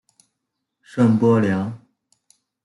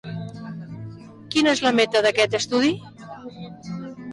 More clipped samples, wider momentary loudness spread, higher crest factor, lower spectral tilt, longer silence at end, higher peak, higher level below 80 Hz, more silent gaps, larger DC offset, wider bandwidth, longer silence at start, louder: neither; second, 16 LU vs 20 LU; about the same, 18 dB vs 16 dB; first, -8.5 dB/octave vs -4 dB/octave; first, 0.9 s vs 0 s; first, -4 dBFS vs -8 dBFS; second, -66 dBFS vs -60 dBFS; neither; neither; about the same, 11.5 kHz vs 11.5 kHz; first, 0.95 s vs 0.05 s; about the same, -19 LUFS vs -20 LUFS